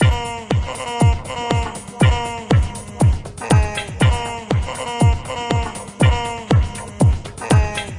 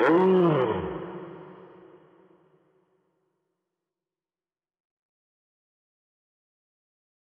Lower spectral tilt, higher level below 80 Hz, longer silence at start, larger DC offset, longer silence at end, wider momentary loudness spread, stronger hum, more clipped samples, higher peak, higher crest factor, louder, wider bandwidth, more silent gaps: second, -6 dB/octave vs -9 dB/octave; first, -26 dBFS vs -64 dBFS; about the same, 0 s vs 0 s; neither; second, 0 s vs 5.85 s; second, 7 LU vs 25 LU; neither; neither; first, -4 dBFS vs -12 dBFS; about the same, 14 dB vs 18 dB; first, -19 LUFS vs -23 LUFS; first, 11.5 kHz vs 5.2 kHz; neither